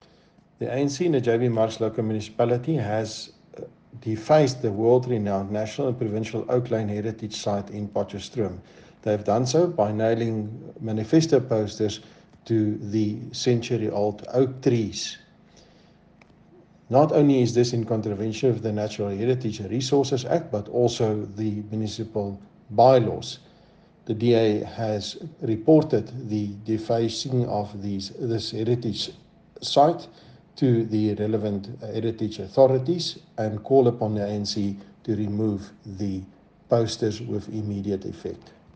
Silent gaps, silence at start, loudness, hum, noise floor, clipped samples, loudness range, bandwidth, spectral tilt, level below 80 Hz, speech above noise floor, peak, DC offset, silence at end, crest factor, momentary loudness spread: none; 0.6 s; -24 LUFS; none; -57 dBFS; under 0.1%; 4 LU; 9.4 kHz; -6.5 dB/octave; -60 dBFS; 33 dB; -4 dBFS; under 0.1%; 0.25 s; 20 dB; 13 LU